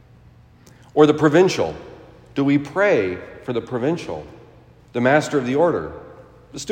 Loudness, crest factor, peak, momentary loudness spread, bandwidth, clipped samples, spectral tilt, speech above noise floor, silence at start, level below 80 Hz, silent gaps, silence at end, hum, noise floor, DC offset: -19 LUFS; 20 dB; 0 dBFS; 18 LU; 15.5 kHz; under 0.1%; -6 dB/octave; 30 dB; 0.95 s; -54 dBFS; none; 0 s; none; -49 dBFS; under 0.1%